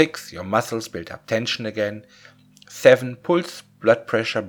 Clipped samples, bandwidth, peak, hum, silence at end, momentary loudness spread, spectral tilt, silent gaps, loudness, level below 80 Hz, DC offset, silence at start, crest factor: under 0.1%; 19.5 kHz; 0 dBFS; 50 Hz at -60 dBFS; 0 s; 18 LU; -4.5 dB/octave; none; -21 LUFS; -64 dBFS; under 0.1%; 0 s; 22 dB